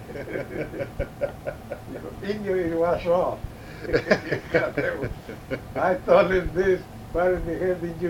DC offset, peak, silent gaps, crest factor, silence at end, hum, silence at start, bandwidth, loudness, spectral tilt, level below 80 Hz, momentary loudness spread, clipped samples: under 0.1%; -4 dBFS; none; 22 dB; 0 s; none; 0 s; 16.5 kHz; -25 LUFS; -7 dB/octave; -42 dBFS; 14 LU; under 0.1%